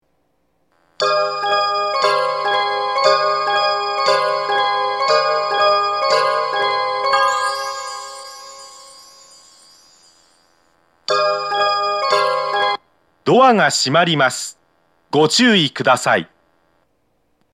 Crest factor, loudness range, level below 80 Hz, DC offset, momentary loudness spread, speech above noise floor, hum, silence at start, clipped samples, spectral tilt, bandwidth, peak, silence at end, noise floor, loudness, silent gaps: 18 dB; 8 LU; -72 dBFS; under 0.1%; 14 LU; 50 dB; none; 1 s; under 0.1%; -3 dB/octave; 15 kHz; 0 dBFS; 1.3 s; -65 dBFS; -16 LUFS; none